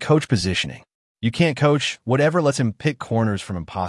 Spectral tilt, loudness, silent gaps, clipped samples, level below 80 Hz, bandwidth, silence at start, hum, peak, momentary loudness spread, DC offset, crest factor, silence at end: -5.5 dB/octave; -21 LUFS; 0.95-1.15 s; under 0.1%; -52 dBFS; 11.5 kHz; 0 s; none; -6 dBFS; 9 LU; under 0.1%; 16 dB; 0 s